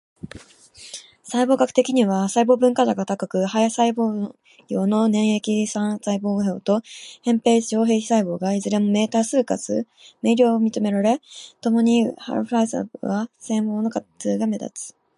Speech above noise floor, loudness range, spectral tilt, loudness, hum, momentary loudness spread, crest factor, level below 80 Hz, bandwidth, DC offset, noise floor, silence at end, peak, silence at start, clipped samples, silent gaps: 26 dB; 3 LU; -5.5 dB/octave; -21 LUFS; none; 11 LU; 18 dB; -66 dBFS; 11.5 kHz; under 0.1%; -46 dBFS; 0.3 s; -2 dBFS; 0.25 s; under 0.1%; none